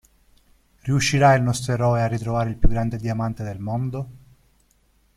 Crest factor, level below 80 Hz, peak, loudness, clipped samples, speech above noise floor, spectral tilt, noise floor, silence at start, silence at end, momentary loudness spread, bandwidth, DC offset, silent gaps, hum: 20 dB; -32 dBFS; -2 dBFS; -22 LUFS; under 0.1%; 41 dB; -6 dB/octave; -61 dBFS; 0.85 s; 1 s; 13 LU; 13.5 kHz; under 0.1%; none; none